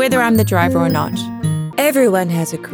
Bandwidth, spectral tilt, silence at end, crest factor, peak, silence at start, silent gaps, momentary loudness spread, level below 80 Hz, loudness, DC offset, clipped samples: over 20 kHz; -5.5 dB/octave; 0 s; 14 dB; 0 dBFS; 0 s; none; 7 LU; -52 dBFS; -16 LUFS; under 0.1%; under 0.1%